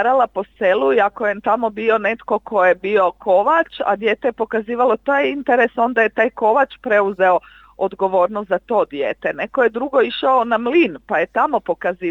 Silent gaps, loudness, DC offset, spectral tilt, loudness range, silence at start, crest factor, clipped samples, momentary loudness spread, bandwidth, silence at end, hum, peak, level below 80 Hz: none; -18 LUFS; under 0.1%; -6.5 dB/octave; 2 LU; 0 s; 16 dB; under 0.1%; 6 LU; 7.2 kHz; 0 s; none; -2 dBFS; -56 dBFS